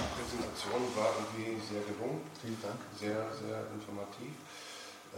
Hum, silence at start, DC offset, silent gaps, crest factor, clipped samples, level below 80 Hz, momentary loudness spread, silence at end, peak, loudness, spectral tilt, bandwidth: none; 0 s; under 0.1%; none; 20 dB; under 0.1%; -60 dBFS; 13 LU; 0 s; -20 dBFS; -39 LUFS; -4.5 dB/octave; 16 kHz